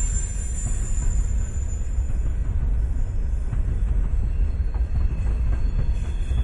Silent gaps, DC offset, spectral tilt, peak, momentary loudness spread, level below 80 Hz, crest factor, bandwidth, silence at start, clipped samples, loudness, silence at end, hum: none; under 0.1%; -6 dB/octave; -10 dBFS; 3 LU; -22 dBFS; 12 dB; 11.5 kHz; 0 s; under 0.1%; -27 LUFS; 0 s; none